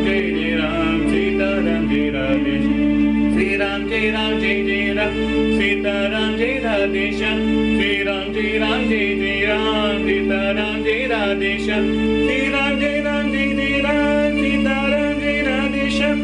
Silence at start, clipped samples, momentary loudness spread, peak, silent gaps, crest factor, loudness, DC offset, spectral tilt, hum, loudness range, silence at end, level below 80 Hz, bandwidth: 0 s; under 0.1%; 2 LU; -8 dBFS; none; 12 dB; -18 LUFS; under 0.1%; -5.5 dB/octave; none; 1 LU; 0 s; -34 dBFS; 10.5 kHz